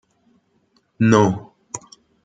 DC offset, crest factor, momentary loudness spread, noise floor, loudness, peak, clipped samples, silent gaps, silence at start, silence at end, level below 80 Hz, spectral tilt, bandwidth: under 0.1%; 20 dB; 19 LU; -63 dBFS; -18 LUFS; -2 dBFS; under 0.1%; none; 1 s; 0.5 s; -58 dBFS; -6.5 dB/octave; 9.2 kHz